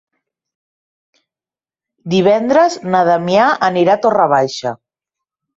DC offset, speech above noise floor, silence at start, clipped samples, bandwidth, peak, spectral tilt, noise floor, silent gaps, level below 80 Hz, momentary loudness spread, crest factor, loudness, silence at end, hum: under 0.1%; over 77 dB; 2.05 s; under 0.1%; 8 kHz; -2 dBFS; -5.5 dB/octave; under -90 dBFS; none; -58 dBFS; 8 LU; 14 dB; -13 LUFS; 0.8 s; none